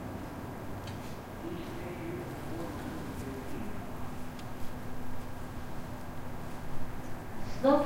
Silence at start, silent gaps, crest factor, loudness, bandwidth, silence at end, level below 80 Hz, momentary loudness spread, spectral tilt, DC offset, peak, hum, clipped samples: 0 s; none; 22 dB; -40 LUFS; 16 kHz; 0 s; -48 dBFS; 4 LU; -6.5 dB/octave; under 0.1%; -12 dBFS; none; under 0.1%